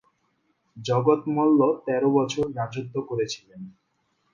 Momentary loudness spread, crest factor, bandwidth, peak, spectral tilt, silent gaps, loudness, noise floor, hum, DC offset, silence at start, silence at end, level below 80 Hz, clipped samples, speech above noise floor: 16 LU; 18 dB; 7.4 kHz; -6 dBFS; -6.5 dB/octave; none; -24 LUFS; -71 dBFS; none; under 0.1%; 0.75 s; 0.65 s; -62 dBFS; under 0.1%; 48 dB